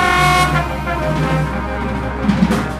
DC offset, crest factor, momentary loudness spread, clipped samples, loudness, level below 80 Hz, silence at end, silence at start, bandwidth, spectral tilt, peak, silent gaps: under 0.1%; 16 dB; 9 LU; under 0.1%; -16 LUFS; -26 dBFS; 0 s; 0 s; 15.5 kHz; -5.5 dB/octave; 0 dBFS; none